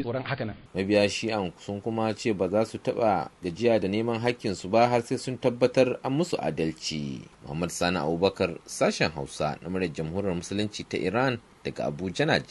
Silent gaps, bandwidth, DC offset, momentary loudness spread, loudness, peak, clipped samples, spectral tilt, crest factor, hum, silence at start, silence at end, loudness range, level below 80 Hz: none; 11.5 kHz; under 0.1%; 9 LU; -27 LUFS; -6 dBFS; under 0.1%; -5.5 dB/octave; 20 dB; none; 0 s; 0.05 s; 3 LU; -58 dBFS